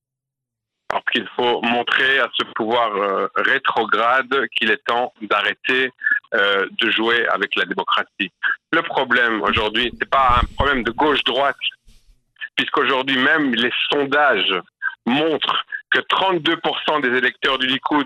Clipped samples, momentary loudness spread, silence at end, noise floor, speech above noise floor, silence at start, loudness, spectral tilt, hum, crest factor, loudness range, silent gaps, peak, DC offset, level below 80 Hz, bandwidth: under 0.1%; 5 LU; 0 s; -84 dBFS; 65 dB; 0.9 s; -18 LUFS; -5 dB/octave; none; 18 dB; 1 LU; none; -2 dBFS; under 0.1%; -42 dBFS; 13 kHz